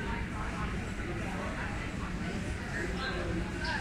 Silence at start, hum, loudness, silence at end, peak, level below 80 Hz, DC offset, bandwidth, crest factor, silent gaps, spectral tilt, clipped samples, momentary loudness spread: 0 s; none; -36 LUFS; 0 s; -22 dBFS; -42 dBFS; under 0.1%; 14.5 kHz; 14 dB; none; -5.5 dB/octave; under 0.1%; 3 LU